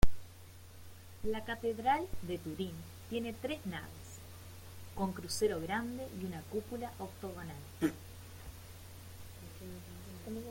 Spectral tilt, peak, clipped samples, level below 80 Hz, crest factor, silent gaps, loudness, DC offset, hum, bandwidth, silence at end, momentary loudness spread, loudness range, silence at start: -5 dB/octave; -12 dBFS; under 0.1%; -48 dBFS; 24 dB; none; -40 LUFS; under 0.1%; none; 17 kHz; 0 s; 17 LU; 5 LU; 0 s